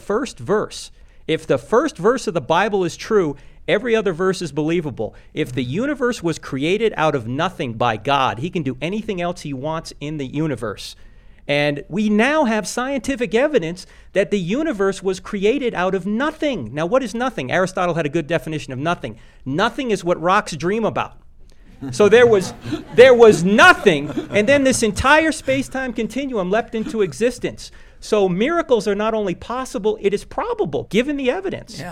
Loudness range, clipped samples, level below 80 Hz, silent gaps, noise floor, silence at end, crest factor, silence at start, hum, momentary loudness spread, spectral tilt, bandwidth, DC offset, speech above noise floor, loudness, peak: 8 LU; under 0.1%; -44 dBFS; none; -42 dBFS; 0 s; 18 dB; 0.05 s; none; 13 LU; -5 dB/octave; 14.5 kHz; under 0.1%; 24 dB; -19 LUFS; 0 dBFS